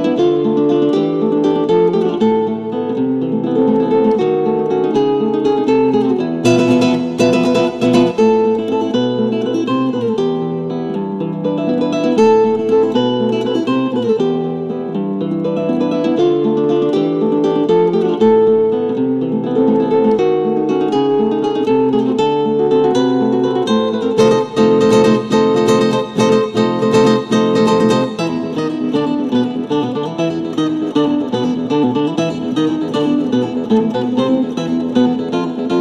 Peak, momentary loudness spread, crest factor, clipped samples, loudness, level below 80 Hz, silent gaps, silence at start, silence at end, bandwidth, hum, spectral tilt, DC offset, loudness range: 0 dBFS; 6 LU; 14 dB; under 0.1%; -15 LUFS; -54 dBFS; none; 0 s; 0 s; 11 kHz; none; -6.5 dB/octave; under 0.1%; 4 LU